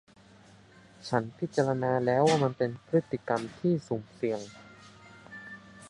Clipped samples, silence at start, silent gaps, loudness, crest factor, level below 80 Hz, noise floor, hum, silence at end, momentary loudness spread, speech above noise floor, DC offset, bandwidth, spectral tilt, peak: under 0.1%; 1 s; none; -29 LUFS; 22 dB; -68 dBFS; -56 dBFS; none; 0 s; 21 LU; 27 dB; under 0.1%; 11 kHz; -6.5 dB/octave; -10 dBFS